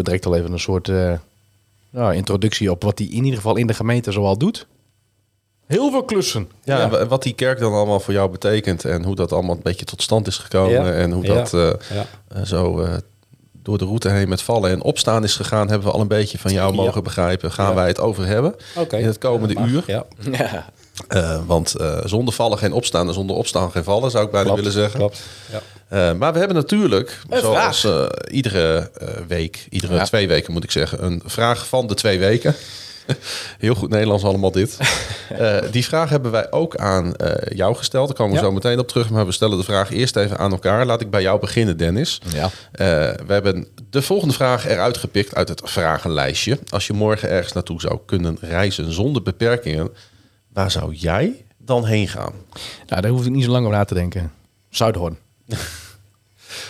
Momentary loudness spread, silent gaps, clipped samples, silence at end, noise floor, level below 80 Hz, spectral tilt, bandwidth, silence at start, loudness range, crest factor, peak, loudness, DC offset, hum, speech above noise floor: 8 LU; none; under 0.1%; 0 s; -65 dBFS; -44 dBFS; -5.5 dB/octave; 15.5 kHz; 0 s; 3 LU; 18 dB; -2 dBFS; -19 LUFS; under 0.1%; none; 46 dB